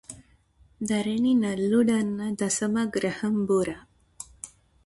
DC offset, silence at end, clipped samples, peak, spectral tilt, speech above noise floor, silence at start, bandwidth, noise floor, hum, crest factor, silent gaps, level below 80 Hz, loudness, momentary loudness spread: under 0.1%; 0.4 s; under 0.1%; -10 dBFS; -5 dB/octave; 35 dB; 0.1 s; 11.5 kHz; -60 dBFS; none; 16 dB; none; -60 dBFS; -25 LUFS; 20 LU